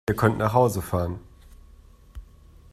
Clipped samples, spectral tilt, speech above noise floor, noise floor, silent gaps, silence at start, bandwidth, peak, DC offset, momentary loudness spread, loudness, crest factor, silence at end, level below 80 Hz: under 0.1%; -7 dB/octave; 28 dB; -50 dBFS; none; 0.1 s; 15.5 kHz; -4 dBFS; under 0.1%; 11 LU; -23 LUFS; 22 dB; 0.5 s; -46 dBFS